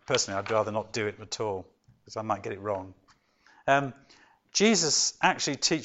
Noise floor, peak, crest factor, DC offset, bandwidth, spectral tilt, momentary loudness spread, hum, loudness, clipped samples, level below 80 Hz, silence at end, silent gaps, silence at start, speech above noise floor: -63 dBFS; -6 dBFS; 22 dB; under 0.1%; 8.2 kHz; -2.5 dB/octave; 14 LU; none; -27 LUFS; under 0.1%; -66 dBFS; 0 s; none; 0.1 s; 35 dB